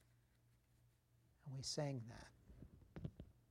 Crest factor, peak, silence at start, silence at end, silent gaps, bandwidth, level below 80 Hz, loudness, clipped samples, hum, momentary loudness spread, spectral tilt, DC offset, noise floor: 22 dB; -32 dBFS; 1.45 s; 0.1 s; none; 15.5 kHz; -70 dBFS; -50 LUFS; under 0.1%; none; 19 LU; -4.5 dB/octave; under 0.1%; -76 dBFS